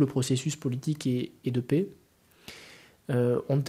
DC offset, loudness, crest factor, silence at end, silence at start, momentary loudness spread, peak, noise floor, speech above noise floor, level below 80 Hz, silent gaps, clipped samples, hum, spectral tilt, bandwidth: under 0.1%; -29 LUFS; 18 dB; 0 s; 0 s; 21 LU; -12 dBFS; -52 dBFS; 25 dB; -68 dBFS; none; under 0.1%; none; -6.5 dB/octave; 15 kHz